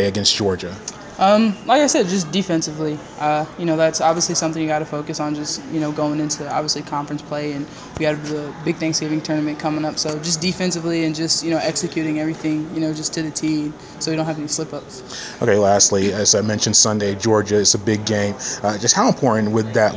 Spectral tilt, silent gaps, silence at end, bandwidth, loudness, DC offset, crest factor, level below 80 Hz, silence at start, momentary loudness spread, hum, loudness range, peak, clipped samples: -3.5 dB/octave; none; 0 s; 8 kHz; -19 LUFS; under 0.1%; 18 dB; -50 dBFS; 0 s; 11 LU; none; 7 LU; 0 dBFS; under 0.1%